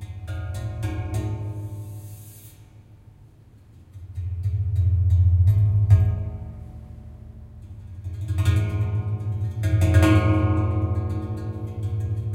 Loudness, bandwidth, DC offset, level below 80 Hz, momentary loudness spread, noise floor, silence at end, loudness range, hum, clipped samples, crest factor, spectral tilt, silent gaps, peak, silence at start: -23 LUFS; 13.5 kHz; under 0.1%; -40 dBFS; 23 LU; -50 dBFS; 0 s; 12 LU; none; under 0.1%; 18 dB; -8 dB/octave; none; -4 dBFS; 0 s